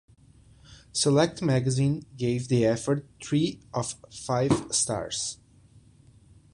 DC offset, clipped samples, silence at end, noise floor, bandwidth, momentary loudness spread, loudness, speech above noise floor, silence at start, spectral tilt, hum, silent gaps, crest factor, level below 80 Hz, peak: under 0.1%; under 0.1%; 1.2 s; -56 dBFS; 11.5 kHz; 9 LU; -27 LUFS; 30 dB; 0.7 s; -5 dB/octave; none; none; 20 dB; -56 dBFS; -8 dBFS